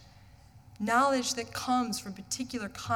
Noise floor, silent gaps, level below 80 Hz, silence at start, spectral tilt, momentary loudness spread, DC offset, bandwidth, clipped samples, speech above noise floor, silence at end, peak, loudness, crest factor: -55 dBFS; none; -62 dBFS; 0 s; -3 dB/octave; 12 LU; under 0.1%; 18.5 kHz; under 0.1%; 25 dB; 0 s; -14 dBFS; -31 LUFS; 18 dB